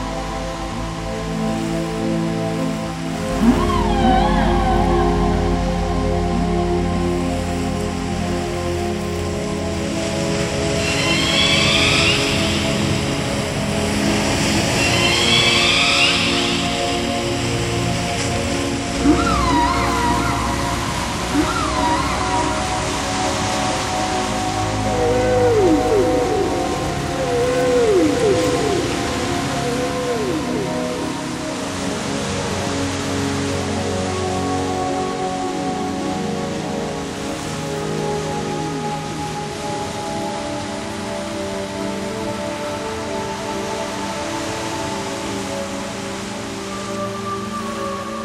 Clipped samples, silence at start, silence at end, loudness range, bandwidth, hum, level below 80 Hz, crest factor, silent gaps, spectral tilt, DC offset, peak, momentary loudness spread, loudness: under 0.1%; 0 s; 0 s; 9 LU; 16 kHz; none; -32 dBFS; 18 dB; none; -4 dB/octave; under 0.1%; -2 dBFS; 10 LU; -19 LUFS